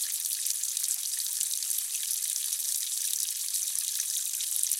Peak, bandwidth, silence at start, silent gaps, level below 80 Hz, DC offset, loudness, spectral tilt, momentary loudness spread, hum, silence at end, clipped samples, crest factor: -6 dBFS; 17 kHz; 0 s; none; under -90 dBFS; under 0.1%; -28 LUFS; 7.5 dB/octave; 1 LU; none; 0 s; under 0.1%; 24 dB